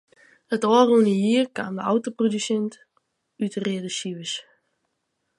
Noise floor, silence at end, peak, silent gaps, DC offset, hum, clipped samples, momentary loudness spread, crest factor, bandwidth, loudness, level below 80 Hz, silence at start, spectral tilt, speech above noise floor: -76 dBFS; 1 s; -4 dBFS; none; under 0.1%; none; under 0.1%; 13 LU; 20 dB; 11.5 kHz; -23 LUFS; -74 dBFS; 0.5 s; -5 dB/octave; 54 dB